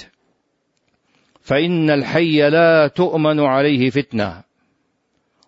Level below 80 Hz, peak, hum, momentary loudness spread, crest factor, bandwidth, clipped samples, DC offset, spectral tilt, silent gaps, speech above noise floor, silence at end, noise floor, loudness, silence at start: -56 dBFS; -4 dBFS; none; 8 LU; 14 dB; 7.6 kHz; under 0.1%; under 0.1%; -7.5 dB/octave; none; 53 dB; 1.05 s; -68 dBFS; -16 LUFS; 1.5 s